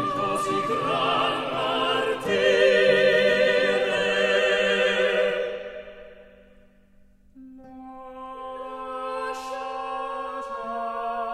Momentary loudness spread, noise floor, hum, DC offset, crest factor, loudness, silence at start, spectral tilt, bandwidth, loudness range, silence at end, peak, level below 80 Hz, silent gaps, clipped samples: 19 LU; -55 dBFS; none; under 0.1%; 18 dB; -23 LUFS; 0 s; -3.5 dB/octave; 13 kHz; 17 LU; 0 s; -8 dBFS; -58 dBFS; none; under 0.1%